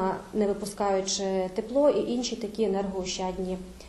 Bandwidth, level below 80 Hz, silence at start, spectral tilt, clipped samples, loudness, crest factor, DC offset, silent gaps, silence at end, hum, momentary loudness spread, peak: 12.5 kHz; -52 dBFS; 0 s; -4.5 dB/octave; under 0.1%; -28 LUFS; 16 dB; under 0.1%; none; 0 s; none; 7 LU; -12 dBFS